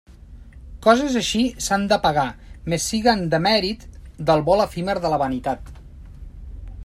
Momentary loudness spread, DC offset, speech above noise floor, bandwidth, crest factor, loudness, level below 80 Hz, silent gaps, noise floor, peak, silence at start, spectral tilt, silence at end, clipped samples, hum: 16 LU; under 0.1%; 22 dB; 15 kHz; 20 dB; -20 LUFS; -40 dBFS; none; -42 dBFS; -2 dBFS; 0.1 s; -4.5 dB/octave; 0 s; under 0.1%; none